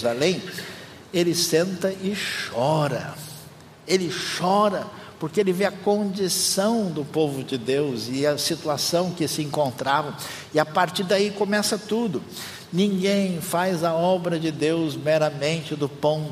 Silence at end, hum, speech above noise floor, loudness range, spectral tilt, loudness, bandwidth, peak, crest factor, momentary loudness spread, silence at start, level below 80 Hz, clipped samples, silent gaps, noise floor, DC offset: 0 s; none; 21 dB; 2 LU; -4.5 dB/octave; -23 LUFS; 15.5 kHz; -4 dBFS; 20 dB; 10 LU; 0 s; -66 dBFS; under 0.1%; none; -45 dBFS; under 0.1%